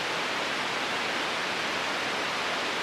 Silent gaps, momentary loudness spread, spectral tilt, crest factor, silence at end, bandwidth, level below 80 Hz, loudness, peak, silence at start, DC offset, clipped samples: none; 0 LU; -1.5 dB/octave; 14 dB; 0 s; 14 kHz; -68 dBFS; -28 LUFS; -16 dBFS; 0 s; under 0.1%; under 0.1%